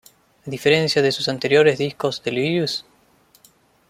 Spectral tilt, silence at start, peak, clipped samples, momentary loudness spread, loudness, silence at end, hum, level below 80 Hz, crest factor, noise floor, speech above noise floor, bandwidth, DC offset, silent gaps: -5 dB/octave; 0.45 s; -4 dBFS; under 0.1%; 11 LU; -19 LUFS; 1.1 s; none; -62 dBFS; 18 dB; -57 dBFS; 37 dB; 15.5 kHz; under 0.1%; none